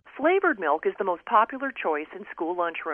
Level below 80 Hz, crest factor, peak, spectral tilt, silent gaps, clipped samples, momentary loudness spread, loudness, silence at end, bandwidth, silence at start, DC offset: -72 dBFS; 20 dB; -6 dBFS; -7.5 dB/octave; none; under 0.1%; 9 LU; -26 LUFS; 0 s; 3.6 kHz; 0.05 s; under 0.1%